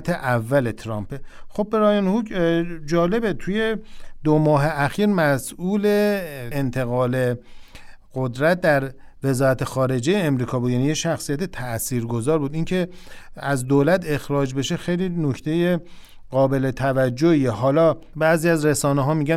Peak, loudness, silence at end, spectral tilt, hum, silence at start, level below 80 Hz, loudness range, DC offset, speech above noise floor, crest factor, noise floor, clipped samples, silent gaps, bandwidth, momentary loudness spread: -6 dBFS; -21 LUFS; 0 s; -6 dB/octave; none; 0 s; -44 dBFS; 3 LU; under 0.1%; 20 dB; 16 dB; -41 dBFS; under 0.1%; none; 16 kHz; 9 LU